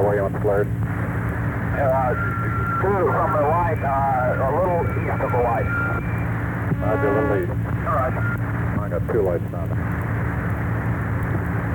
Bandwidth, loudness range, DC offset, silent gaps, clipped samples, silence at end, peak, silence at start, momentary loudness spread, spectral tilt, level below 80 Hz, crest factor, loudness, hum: 19 kHz; 3 LU; under 0.1%; none; under 0.1%; 0 s; -8 dBFS; 0 s; 5 LU; -9.5 dB/octave; -34 dBFS; 14 dB; -22 LUFS; none